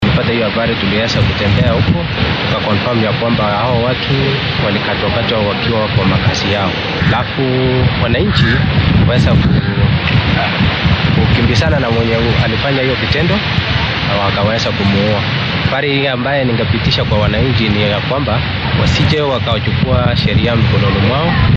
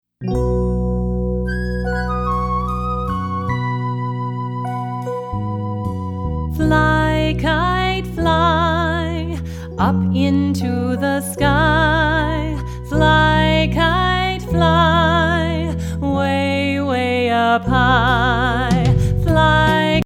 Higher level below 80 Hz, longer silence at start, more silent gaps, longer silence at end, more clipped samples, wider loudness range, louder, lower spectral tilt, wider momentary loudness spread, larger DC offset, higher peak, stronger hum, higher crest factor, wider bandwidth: about the same, -28 dBFS vs -28 dBFS; second, 0 s vs 0.2 s; neither; about the same, 0 s vs 0 s; neither; second, 2 LU vs 6 LU; first, -13 LUFS vs -17 LUFS; about the same, -6.5 dB/octave vs -6.5 dB/octave; second, 3 LU vs 10 LU; neither; about the same, -2 dBFS vs -2 dBFS; second, none vs 60 Hz at -50 dBFS; second, 10 dB vs 16 dB; second, 7.8 kHz vs 15.5 kHz